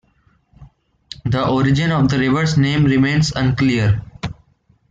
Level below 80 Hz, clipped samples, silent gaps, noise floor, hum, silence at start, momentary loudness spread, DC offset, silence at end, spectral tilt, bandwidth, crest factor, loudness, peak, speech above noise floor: -40 dBFS; under 0.1%; none; -58 dBFS; none; 0.6 s; 14 LU; under 0.1%; 0.6 s; -6.5 dB/octave; 8 kHz; 12 dB; -16 LUFS; -4 dBFS; 43 dB